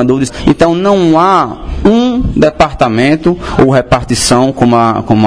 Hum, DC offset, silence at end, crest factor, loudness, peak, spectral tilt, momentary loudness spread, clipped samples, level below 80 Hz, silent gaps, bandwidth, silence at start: none; 0.8%; 0 s; 8 dB; -9 LUFS; 0 dBFS; -5.5 dB/octave; 4 LU; 1%; -26 dBFS; none; 11 kHz; 0 s